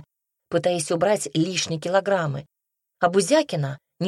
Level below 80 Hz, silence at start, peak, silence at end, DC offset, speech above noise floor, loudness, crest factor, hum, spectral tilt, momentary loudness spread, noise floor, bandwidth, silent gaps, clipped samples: -66 dBFS; 0.5 s; -6 dBFS; 0 s; under 0.1%; 38 dB; -23 LUFS; 18 dB; none; -4.5 dB/octave; 8 LU; -60 dBFS; 13 kHz; none; under 0.1%